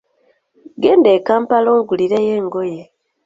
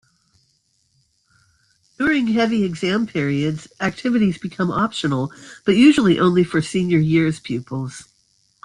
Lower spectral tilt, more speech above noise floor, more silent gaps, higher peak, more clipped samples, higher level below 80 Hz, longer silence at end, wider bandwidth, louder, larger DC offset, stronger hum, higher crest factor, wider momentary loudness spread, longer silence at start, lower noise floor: about the same, -7 dB/octave vs -6.5 dB/octave; about the same, 46 dB vs 46 dB; neither; about the same, 0 dBFS vs -2 dBFS; neither; second, -60 dBFS vs -54 dBFS; second, 0.45 s vs 0.6 s; second, 7.6 kHz vs 11 kHz; first, -15 LUFS vs -19 LUFS; neither; neither; about the same, 14 dB vs 16 dB; about the same, 11 LU vs 13 LU; second, 0.8 s vs 2 s; second, -60 dBFS vs -65 dBFS